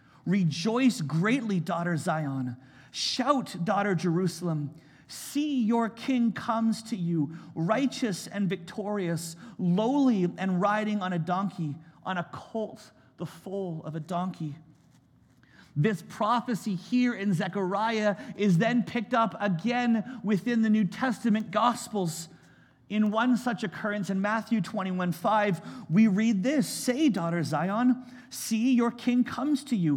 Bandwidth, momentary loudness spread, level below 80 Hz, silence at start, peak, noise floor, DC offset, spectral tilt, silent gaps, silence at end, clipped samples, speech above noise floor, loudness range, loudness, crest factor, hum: 16.5 kHz; 10 LU; -74 dBFS; 0.25 s; -10 dBFS; -61 dBFS; under 0.1%; -6 dB/octave; none; 0 s; under 0.1%; 33 dB; 6 LU; -28 LUFS; 18 dB; none